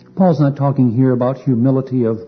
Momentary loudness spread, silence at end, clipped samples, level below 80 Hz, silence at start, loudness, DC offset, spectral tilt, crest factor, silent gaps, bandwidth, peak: 3 LU; 0 s; under 0.1%; -58 dBFS; 0.15 s; -15 LUFS; under 0.1%; -11 dB/octave; 12 dB; none; 6 kHz; -2 dBFS